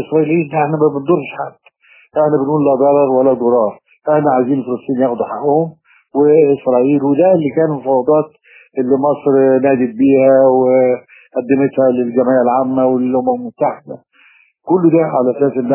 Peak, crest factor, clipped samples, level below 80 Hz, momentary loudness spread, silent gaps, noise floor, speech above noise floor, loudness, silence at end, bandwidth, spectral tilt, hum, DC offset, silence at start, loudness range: 0 dBFS; 12 dB; under 0.1%; -62 dBFS; 11 LU; none; -50 dBFS; 37 dB; -13 LUFS; 0 s; 3.2 kHz; -12.5 dB/octave; none; under 0.1%; 0 s; 3 LU